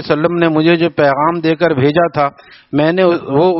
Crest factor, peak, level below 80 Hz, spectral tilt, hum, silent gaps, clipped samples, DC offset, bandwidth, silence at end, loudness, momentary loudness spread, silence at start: 12 dB; 0 dBFS; -52 dBFS; -5 dB/octave; none; none; under 0.1%; under 0.1%; 5.8 kHz; 0 s; -13 LUFS; 4 LU; 0 s